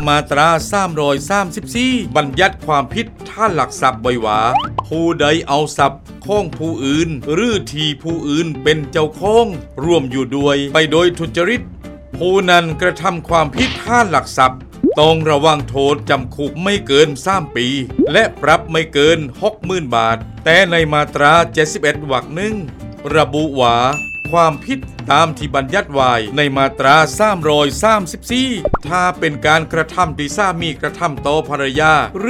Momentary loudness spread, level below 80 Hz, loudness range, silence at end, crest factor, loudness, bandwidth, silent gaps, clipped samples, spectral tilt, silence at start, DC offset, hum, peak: 8 LU; -36 dBFS; 3 LU; 0 s; 14 dB; -15 LUFS; 16 kHz; none; under 0.1%; -4.5 dB/octave; 0 s; under 0.1%; none; 0 dBFS